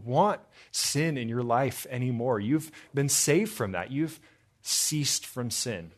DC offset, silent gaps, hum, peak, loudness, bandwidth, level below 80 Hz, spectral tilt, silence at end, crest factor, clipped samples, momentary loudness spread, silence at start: under 0.1%; none; none; -10 dBFS; -28 LUFS; 14 kHz; -68 dBFS; -4 dB/octave; 0.05 s; 18 dB; under 0.1%; 8 LU; 0 s